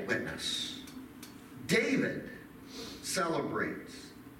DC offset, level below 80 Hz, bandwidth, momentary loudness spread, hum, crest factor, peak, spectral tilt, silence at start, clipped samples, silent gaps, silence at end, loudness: under 0.1%; -64 dBFS; 17 kHz; 18 LU; none; 20 dB; -16 dBFS; -3.5 dB/octave; 0 s; under 0.1%; none; 0 s; -34 LUFS